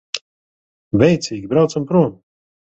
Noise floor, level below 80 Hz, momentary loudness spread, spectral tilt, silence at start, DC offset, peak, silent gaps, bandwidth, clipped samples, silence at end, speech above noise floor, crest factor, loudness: under -90 dBFS; -50 dBFS; 10 LU; -6.5 dB/octave; 0.15 s; under 0.1%; 0 dBFS; 0.21-0.91 s; 8.2 kHz; under 0.1%; 0.6 s; over 74 dB; 18 dB; -17 LUFS